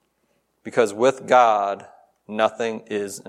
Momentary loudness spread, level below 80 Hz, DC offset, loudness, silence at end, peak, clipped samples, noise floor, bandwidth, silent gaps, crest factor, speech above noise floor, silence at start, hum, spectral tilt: 16 LU; -76 dBFS; under 0.1%; -21 LUFS; 0.1 s; -2 dBFS; under 0.1%; -69 dBFS; 13.5 kHz; none; 20 dB; 48 dB; 0.65 s; none; -4 dB/octave